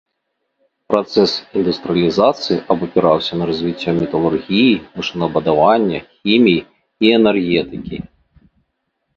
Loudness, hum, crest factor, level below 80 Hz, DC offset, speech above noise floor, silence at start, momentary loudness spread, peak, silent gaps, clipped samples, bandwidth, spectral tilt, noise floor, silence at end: -16 LUFS; none; 16 dB; -48 dBFS; under 0.1%; 57 dB; 0.9 s; 8 LU; 0 dBFS; none; under 0.1%; 7.6 kHz; -6.5 dB/octave; -72 dBFS; 1.15 s